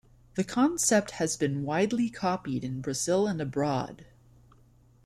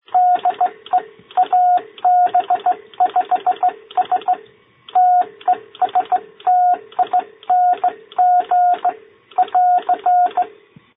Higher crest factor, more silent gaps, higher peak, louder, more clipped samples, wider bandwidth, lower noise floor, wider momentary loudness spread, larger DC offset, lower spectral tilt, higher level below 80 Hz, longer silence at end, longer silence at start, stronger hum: first, 18 dB vs 10 dB; neither; second, -10 dBFS vs -6 dBFS; second, -28 LUFS vs -17 LUFS; neither; first, 15 kHz vs 3.9 kHz; first, -59 dBFS vs -46 dBFS; about the same, 9 LU vs 7 LU; neither; second, -4.5 dB/octave vs -7.5 dB/octave; first, -60 dBFS vs -74 dBFS; first, 1.05 s vs 0.5 s; first, 0.35 s vs 0.15 s; neither